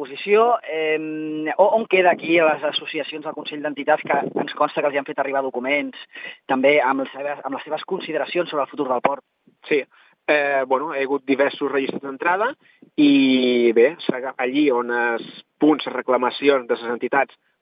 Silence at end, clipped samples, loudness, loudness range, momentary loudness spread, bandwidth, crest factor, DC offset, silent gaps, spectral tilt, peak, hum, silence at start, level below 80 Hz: 0.35 s; under 0.1%; -21 LUFS; 4 LU; 11 LU; 5.2 kHz; 20 dB; under 0.1%; none; -8.5 dB/octave; -2 dBFS; none; 0 s; -86 dBFS